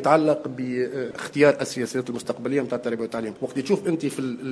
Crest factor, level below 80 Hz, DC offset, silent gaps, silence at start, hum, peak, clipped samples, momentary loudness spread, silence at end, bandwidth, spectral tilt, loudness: 20 dB; -68 dBFS; under 0.1%; none; 0 s; none; -4 dBFS; under 0.1%; 10 LU; 0 s; 11 kHz; -5.5 dB/octave; -25 LUFS